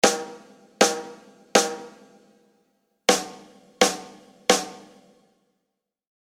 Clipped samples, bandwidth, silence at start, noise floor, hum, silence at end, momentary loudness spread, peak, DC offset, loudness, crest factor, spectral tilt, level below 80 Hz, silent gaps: under 0.1%; 16.5 kHz; 0.05 s; -81 dBFS; none; 1.4 s; 18 LU; 0 dBFS; under 0.1%; -23 LUFS; 26 dB; -1.5 dB/octave; -66 dBFS; none